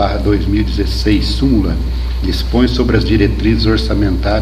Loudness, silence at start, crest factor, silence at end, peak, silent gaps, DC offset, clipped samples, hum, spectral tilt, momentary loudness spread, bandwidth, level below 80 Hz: -14 LUFS; 0 s; 12 dB; 0 s; 0 dBFS; none; under 0.1%; under 0.1%; none; -7 dB/octave; 5 LU; 14 kHz; -16 dBFS